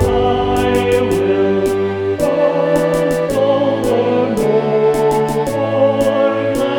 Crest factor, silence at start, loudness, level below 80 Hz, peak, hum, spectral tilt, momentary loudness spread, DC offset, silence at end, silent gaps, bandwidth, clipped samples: 12 dB; 0 s; -15 LUFS; -36 dBFS; -2 dBFS; none; -6 dB/octave; 3 LU; under 0.1%; 0 s; none; 19 kHz; under 0.1%